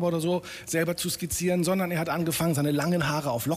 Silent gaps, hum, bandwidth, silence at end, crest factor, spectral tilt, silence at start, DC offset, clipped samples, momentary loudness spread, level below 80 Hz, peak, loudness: none; none; 15.5 kHz; 0 s; 12 dB; -5 dB/octave; 0 s; under 0.1%; under 0.1%; 4 LU; -54 dBFS; -14 dBFS; -27 LUFS